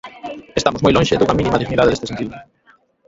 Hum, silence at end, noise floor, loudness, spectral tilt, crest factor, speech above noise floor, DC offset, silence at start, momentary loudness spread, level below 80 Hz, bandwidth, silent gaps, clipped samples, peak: none; 0.65 s; -54 dBFS; -17 LUFS; -5.5 dB/octave; 18 dB; 38 dB; under 0.1%; 0.05 s; 14 LU; -38 dBFS; 8 kHz; none; under 0.1%; 0 dBFS